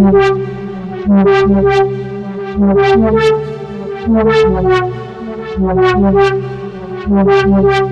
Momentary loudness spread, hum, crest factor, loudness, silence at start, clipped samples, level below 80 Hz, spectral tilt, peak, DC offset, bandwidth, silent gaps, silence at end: 14 LU; none; 10 dB; -12 LUFS; 0 s; under 0.1%; -30 dBFS; -7.5 dB/octave; 0 dBFS; under 0.1%; 8 kHz; none; 0 s